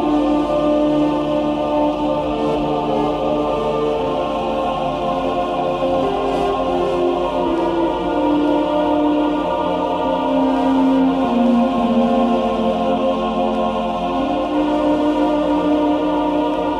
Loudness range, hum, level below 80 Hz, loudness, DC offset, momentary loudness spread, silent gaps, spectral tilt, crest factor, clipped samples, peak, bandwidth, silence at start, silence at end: 3 LU; none; -40 dBFS; -18 LUFS; under 0.1%; 4 LU; none; -7 dB/octave; 12 dB; under 0.1%; -4 dBFS; 10 kHz; 0 s; 0 s